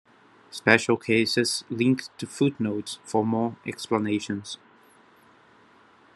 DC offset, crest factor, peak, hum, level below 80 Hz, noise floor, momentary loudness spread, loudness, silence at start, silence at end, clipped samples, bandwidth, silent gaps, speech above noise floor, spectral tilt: under 0.1%; 26 dB; 0 dBFS; none; -70 dBFS; -56 dBFS; 14 LU; -25 LUFS; 0.5 s; 1.6 s; under 0.1%; 12.5 kHz; none; 31 dB; -4.5 dB/octave